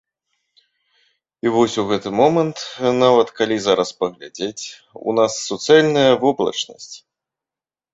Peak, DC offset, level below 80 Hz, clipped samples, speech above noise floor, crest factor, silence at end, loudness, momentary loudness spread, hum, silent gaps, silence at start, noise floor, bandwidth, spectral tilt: -2 dBFS; under 0.1%; -60 dBFS; under 0.1%; over 72 dB; 18 dB; 0.95 s; -18 LUFS; 14 LU; none; none; 1.45 s; under -90 dBFS; 8 kHz; -4.5 dB/octave